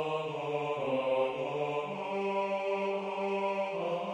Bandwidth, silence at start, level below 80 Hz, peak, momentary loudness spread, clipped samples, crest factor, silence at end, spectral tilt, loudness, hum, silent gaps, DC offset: 10 kHz; 0 s; -76 dBFS; -20 dBFS; 4 LU; under 0.1%; 14 dB; 0 s; -6 dB/octave; -33 LUFS; none; none; under 0.1%